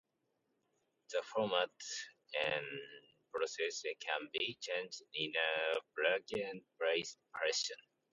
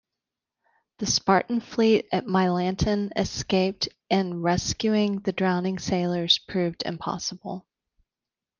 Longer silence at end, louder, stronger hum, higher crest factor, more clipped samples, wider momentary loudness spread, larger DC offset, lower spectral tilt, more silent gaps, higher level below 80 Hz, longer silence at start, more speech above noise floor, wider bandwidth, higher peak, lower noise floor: second, 0.35 s vs 1 s; second, -39 LUFS vs -25 LUFS; neither; about the same, 22 dB vs 20 dB; neither; about the same, 11 LU vs 9 LU; neither; second, -1.5 dB/octave vs -4.5 dB/octave; neither; second, -84 dBFS vs -52 dBFS; about the same, 1.1 s vs 1 s; second, 44 dB vs 65 dB; second, 8.4 kHz vs 9.8 kHz; second, -18 dBFS vs -6 dBFS; second, -83 dBFS vs -90 dBFS